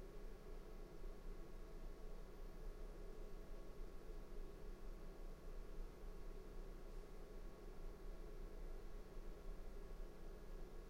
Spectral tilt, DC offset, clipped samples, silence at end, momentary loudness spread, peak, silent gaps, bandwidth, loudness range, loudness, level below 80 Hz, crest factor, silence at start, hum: -6 dB/octave; under 0.1%; under 0.1%; 0 s; 1 LU; -40 dBFS; none; 16 kHz; 0 LU; -59 LUFS; -52 dBFS; 12 dB; 0 s; none